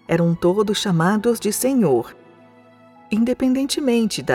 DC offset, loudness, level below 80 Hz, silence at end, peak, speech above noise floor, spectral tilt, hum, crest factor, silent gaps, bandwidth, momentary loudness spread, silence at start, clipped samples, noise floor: under 0.1%; -19 LUFS; -54 dBFS; 0 s; -6 dBFS; 30 dB; -5.5 dB/octave; none; 14 dB; none; 17 kHz; 4 LU; 0.1 s; under 0.1%; -49 dBFS